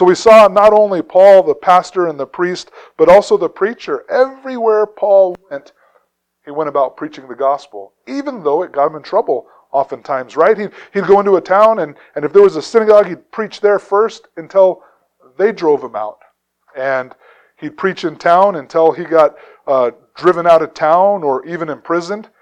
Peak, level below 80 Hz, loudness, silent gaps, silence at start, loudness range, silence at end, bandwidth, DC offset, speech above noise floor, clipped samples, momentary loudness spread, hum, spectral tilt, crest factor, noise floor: 0 dBFS; -54 dBFS; -13 LUFS; none; 0 s; 7 LU; 0.2 s; 10 kHz; under 0.1%; 47 dB; 0.3%; 15 LU; none; -5.5 dB/octave; 14 dB; -59 dBFS